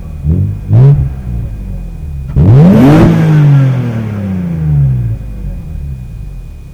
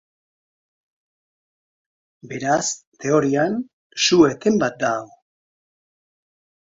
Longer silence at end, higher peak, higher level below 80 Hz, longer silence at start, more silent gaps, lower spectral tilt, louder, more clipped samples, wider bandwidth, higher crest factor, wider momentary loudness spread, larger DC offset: second, 0 s vs 1.6 s; about the same, 0 dBFS vs -2 dBFS; first, -22 dBFS vs -60 dBFS; second, 0 s vs 2.25 s; second, none vs 2.87-2.92 s, 3.73-3.90 s; first, -9.5 dB/octave vs -4 dB/octave; first, -9 LUFS vs -20 LUFS; neither; second, 7 kHz vs 7.8 kHz; second, 8 dB vs 22 dB; first, 19 LU vs 13 LU; first, 0.4% vs under 0.1%